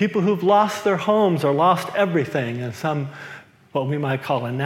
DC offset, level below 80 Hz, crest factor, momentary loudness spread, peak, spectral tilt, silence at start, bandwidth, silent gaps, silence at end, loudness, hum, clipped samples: under 0.1%; -72 dBFS; 16 dB; 10 LU; -4 dBFS; -6.5 dB/octave; 0 s; 16.5 kHz; none; 0 s; -21 LUFS; none; under 0.1%